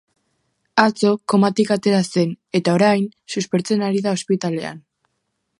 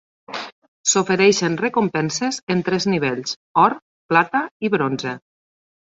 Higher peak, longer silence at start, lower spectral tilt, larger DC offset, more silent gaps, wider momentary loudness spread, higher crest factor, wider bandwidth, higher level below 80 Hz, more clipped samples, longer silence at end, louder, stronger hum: about the same, 0 dBFS vs -2 dBFS; first, 0.75 s vs 0.3 s; first, -5.5 dB/octave vs -4 dB/octave; neither; second, none vs 0.52-0.62 s, 0.68-0.84 s, 2.43-2.47 s, 3.36-3.55 s, 3.82-4.09 s, 4.51-4.60 s; second, 8 LU vs 16 LU; about the same, 20 dB vs 20 dB; first, 11.5 kHz vs 8 kHz; about the same, -66 dBFS vs -62 dBFS; neither; first, 0.8 s vs 0.65 s; about the same, -19 LUFS vs -19 LUFS; neither